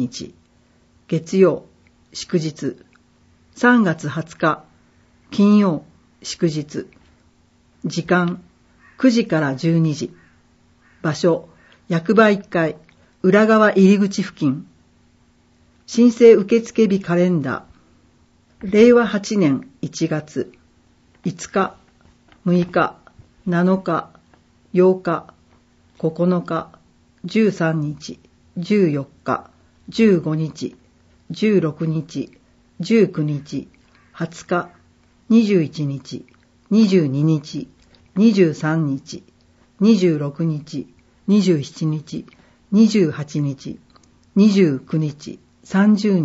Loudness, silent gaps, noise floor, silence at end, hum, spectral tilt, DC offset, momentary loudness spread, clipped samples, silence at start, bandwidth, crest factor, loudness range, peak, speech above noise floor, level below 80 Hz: -18 LUFS; none; -56 dBFS; 0 s; none; -6.5 dB/octave; under 0.1%; 17 LU; under 0.1%; 0 s; 8 kHz; 18 dB; 6 LU; 0 dBFS; 39 dB; -58 dBFS